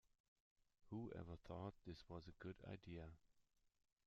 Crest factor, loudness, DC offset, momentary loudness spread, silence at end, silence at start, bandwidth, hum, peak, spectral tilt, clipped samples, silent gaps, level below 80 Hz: 20 dB; -57 LUFS; under 0.1%; 5 LU; 0.4 s; 0.8 s; 7.2 kHz; none; -38 dBFS; -6.5 dB/octave; under 0.1%; none; -74 dBFS